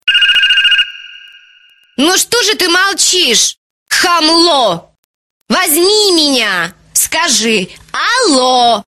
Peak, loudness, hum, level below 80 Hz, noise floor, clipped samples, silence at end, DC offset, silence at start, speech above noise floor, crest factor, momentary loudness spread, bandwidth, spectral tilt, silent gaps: 0 dBFS; -9 LUFS; none; -52 dBFS; -46 dBFS; under 0.1%; 0.05 s; 0.3%; 0.05 s; 36 dB; 12 dB; 9 LU; 16 kHz; -0.5 dB/octave; 3.58-3.86 s, 4.98-5.45 s